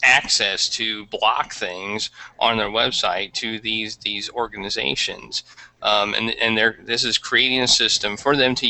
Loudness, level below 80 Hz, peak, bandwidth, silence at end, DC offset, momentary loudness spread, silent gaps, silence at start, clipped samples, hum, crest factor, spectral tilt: -20 LUFS; -52 dBFS; -2 dBFS; 9 kHz; 0 s; under 0.1%; 11 LU; none; 0 s; under 0.1%; none; 18 dB; -1.5 dB/octave